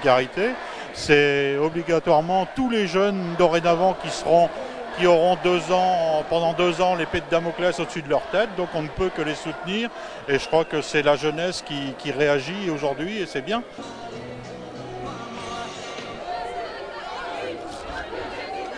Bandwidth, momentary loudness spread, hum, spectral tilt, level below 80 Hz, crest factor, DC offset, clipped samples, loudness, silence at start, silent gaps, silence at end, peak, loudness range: 10.5 kHz; 14 LU; none; -5 dB/octave; -50 dBFS; 20 dB; under 0.1%; under 0.1%; -23 LUFS; 0 s; none; 0 s; -2 dBFS; 12 LU